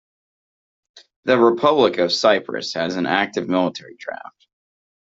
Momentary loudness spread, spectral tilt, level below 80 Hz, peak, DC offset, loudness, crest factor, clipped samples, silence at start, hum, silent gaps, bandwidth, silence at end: 17 LU; -4.5 dB/octave; -64 dBFS; -2 dBFS; under 0.1%; -19 LUFS; 18 dB; under 0.1%; 0.95 s; none; 1.16-1.23 s; 7.8 kHz; 1 s